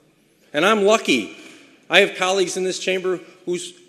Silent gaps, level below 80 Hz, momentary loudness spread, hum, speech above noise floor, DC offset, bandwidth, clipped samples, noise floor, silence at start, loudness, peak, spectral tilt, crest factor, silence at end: none; -74 dBFS; 12 LU; none; 38 dB; under 0.1%; 13.5 kHz; under 0.1%; -57 dBFS; 0.55 s; -19 LUFS; 0 dBFS; -3 dB/octave; 20 dB; 0.15 s